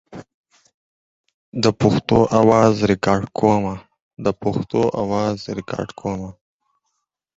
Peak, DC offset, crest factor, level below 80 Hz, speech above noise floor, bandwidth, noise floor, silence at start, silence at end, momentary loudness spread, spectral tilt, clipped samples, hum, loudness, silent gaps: -2 dBFS; under 0.1%; 20 dB; -48 dBFS; 57 dB; 8 kHz; -75 dBFS; 0.1 s; 1.05 s; 14 LU; -6.5 dB/octave; under 0.1%; none; -19 LUFS; 0.34-0.44 s, 0.74-1.24 s, 1.34-1.52 s, 4.02-4.11 s